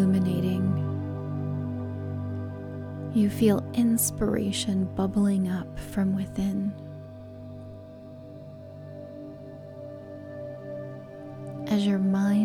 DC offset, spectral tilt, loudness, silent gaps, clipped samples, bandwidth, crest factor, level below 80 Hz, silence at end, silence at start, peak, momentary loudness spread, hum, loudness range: under 0.1%; -6 dB/octave; -27 LUFS; none; under 0.1%; 17.5 kHz; 18 dB; -52 dBFS; 0 s; 0 s; -10 dBFS; 19 LU; none; 16 LU